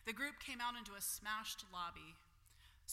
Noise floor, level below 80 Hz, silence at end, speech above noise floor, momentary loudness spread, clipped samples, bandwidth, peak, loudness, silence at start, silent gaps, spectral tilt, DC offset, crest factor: -67 dBFS; -68 dBFS; 0 s; 20 dB; 14 LU; under 0.1%; 16.5 kHz; -30 dBFS; -45 LUFS; 0 s; none; -1 dB/octave; under 0.1%; 18 dB